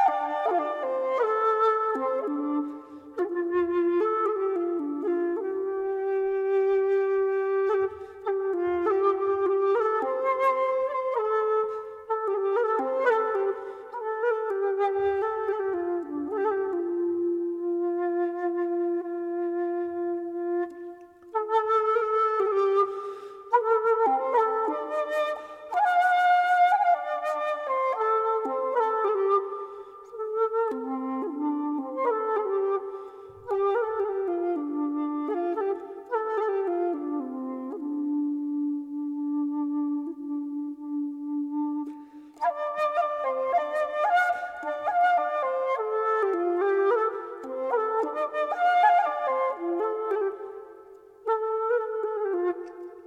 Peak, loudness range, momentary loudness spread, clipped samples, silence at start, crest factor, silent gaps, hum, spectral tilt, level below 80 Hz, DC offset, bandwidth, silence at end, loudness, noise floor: -10 dBFS; 5 LU; 9 LU; under 0.1%; 0 s; 16 dB; none; none; -5 dB/octave; -72 dBFS; under 0.1%; 8.8 kHz; 0 s; -27 LUFS; -49 dBFS